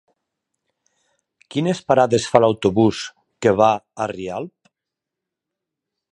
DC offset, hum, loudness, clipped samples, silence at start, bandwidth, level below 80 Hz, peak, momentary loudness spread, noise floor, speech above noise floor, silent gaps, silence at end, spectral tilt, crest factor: under 0.1%; none; -19 LUFS; under 0.1%; 1.55 s; 11 kHz; -54 dBFS; 0 dBFS; 15 LU; -85 dBFS; 67 dB; none; 1.65 s; -6 dB/octave; 22 dB